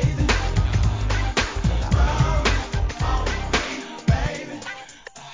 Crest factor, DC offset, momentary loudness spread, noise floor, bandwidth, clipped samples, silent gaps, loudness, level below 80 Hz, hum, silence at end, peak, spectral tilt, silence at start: 16 dB; 0.2%; 12 LU; -41 dBFS; 7.6 kHz; under 0.1%; none; -23 LUFS; -24 dBFS; none; 0 s; -4 dBFS; -5 dB/octave; 0 s